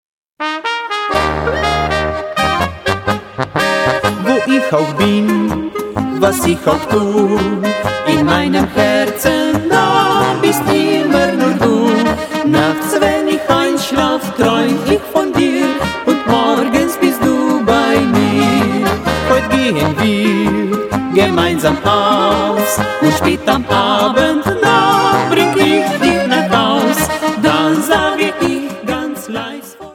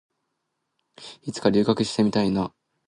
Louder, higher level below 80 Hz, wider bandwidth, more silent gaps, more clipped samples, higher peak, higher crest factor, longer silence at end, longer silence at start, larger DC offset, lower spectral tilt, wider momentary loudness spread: first, -13 LUFS vs -23 LUFS; first, -36 dBFS vs -56 dBFS; first, 17.5 kHz vs 11 kHz; neither; neither; first, 0 dBFS vs -6 dBFS; second, 14 dB vs 20 dB; second, 0 s vs 0.4 s; second, 0.4 s vs 1 s; neither; about the same, -5 dB/octave vs -6 dB/octave; second, 6 LU vs 17 LU